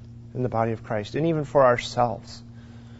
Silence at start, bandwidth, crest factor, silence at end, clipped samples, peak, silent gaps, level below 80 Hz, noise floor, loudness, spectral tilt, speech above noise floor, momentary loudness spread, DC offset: 0 s; 8 kHz; 20 dB; 0 s; under 0.1%; -6 dBFS; none; -52 dBFS; -43 dBFS; -24 LUFS; -6.5 dB/octave; 20 dB; 23 LU; under 0.1%